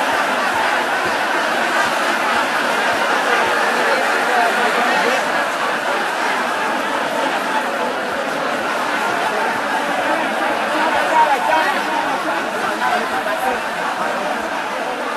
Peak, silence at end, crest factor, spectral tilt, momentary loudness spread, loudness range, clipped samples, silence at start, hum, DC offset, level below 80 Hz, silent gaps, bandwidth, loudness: -2 dBFS; 0 s; 16 dB; -2 dB/octave; 5 LU; 3 LU; under 0.1%; 0 s; none; under 0.1%; -58 dBFS; none; 14 kHz; -17 LUFS